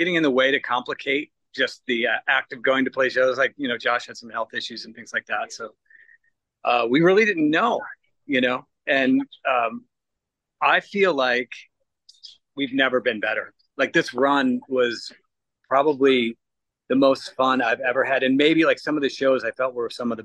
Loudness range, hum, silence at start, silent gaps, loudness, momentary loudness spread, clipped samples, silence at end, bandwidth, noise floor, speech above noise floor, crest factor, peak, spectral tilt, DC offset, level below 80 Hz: 4 LU; none; 0 s; none; -22 LUFS; 11 LU; under 0.1%; 0 s; 9.8 kHz; -83 dBFS; 61 dB; 18 dB; -6 dBFS; -5 dB/octave; under 0.1%; -72 dBFS